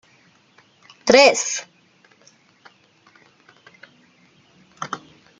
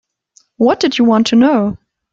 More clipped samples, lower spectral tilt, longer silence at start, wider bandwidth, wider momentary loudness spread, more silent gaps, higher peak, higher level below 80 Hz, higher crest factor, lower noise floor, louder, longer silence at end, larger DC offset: neither; second, -1.5 dB/octave vs -5.5 dB/octave; first, 1.05 s vs 0.6 s; first, 9.6 kHz vs 7.8 kHz; first, 22 LU vs 9 LU; neither; about the same, -2 dBFS vs -2 dBFS; second, -64 dBFS vs -52 dBFS; first, 24 dB vs 12 dB; about the same, -56 dBFS vs -54 dBFS; second, -17 LUFS vs -13 LUFS; about the same, 0.4 s vs 0.35 s; neither